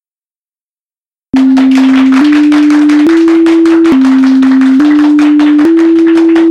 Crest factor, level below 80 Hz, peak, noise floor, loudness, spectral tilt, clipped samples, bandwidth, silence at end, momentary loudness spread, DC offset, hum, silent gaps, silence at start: 6 dB; -48 dBFS; 0 dBFS; under -90 dBFS; -6 LUFS; -5 dB/octave; 0.2%; 9.8 kHz; 0 s; 0 LU; under 0.1%; none; none; 1.35 s